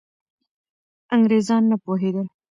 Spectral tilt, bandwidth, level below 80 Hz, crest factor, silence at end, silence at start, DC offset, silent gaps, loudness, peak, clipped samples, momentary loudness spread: -7 dB/octave; 7.6 kHz; -72 dBFS; 16 dB; 0.25 s; 1.1 s; under 0.1%; none; -20 LUFS; -6 dBFS; under 0.1%; 7 LU